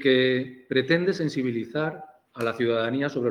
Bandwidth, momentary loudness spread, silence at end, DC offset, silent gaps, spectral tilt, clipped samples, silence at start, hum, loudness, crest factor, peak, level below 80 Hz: 12 kHz; 9 LU; 0 s; under 0.1%; none; -6.5 dB/octave; under 0.1%; 0 s; none; -25 LUFS; 18 dB; -8 dBFS; -70 dBFS